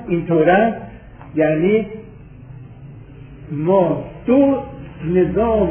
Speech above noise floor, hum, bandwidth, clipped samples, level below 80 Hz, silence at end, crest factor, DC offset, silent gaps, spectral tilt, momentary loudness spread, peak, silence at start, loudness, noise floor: 22 dB; none; 3.5 kHz; under 0.1%; -40 dBFS; 0 s; 16 dB; under 0.1%; none; -11.5 dB/octave; 24 LU; -2 dBFS; 0 s; -17 LUFS; -38 dBFS